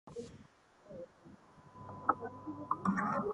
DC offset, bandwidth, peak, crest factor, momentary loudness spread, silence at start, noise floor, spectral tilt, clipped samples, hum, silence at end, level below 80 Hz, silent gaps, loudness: under 0.1%; 11 kHz; -14 dBFS; 26 dB; 25 LU; 0.05 s; -62 dBFS; -7.5 dB/octave; under 0.1%; none; 0 s; -68 dBFS; none; -38 LUFS